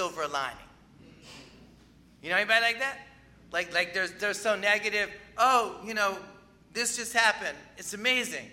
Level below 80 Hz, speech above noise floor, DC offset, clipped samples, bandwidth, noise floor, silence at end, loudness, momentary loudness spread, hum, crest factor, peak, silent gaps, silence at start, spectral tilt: -64 dBFS; 28 dB; under 0.1%; under 0.1%; 16 kHz; -57 dBFS; 0 s; -27 LUFS; 15 LU; none; 24 dB; -6 dBFS; none; 0 s; -1 dB/octave